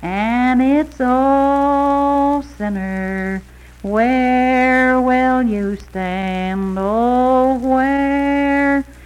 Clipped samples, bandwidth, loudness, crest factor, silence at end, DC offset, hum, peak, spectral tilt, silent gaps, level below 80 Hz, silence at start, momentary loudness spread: under 0.1%; 11 kHz; -16 LUFS; 12 dB; 0 s; under 0.1%; none; -4 dBFS; -7 dB/octave; none; -38 dBFS; 0 s; 9 LU